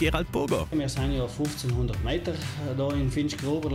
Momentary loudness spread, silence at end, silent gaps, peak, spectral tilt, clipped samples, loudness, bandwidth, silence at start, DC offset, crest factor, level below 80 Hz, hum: 3 LU; 0 s; none; -12 dBFS; -6 dB/octave; under 0.1%; -29 LUFS; 16 kHz; 0 s; under 0.1%; 16 dB; -38 dBFS; none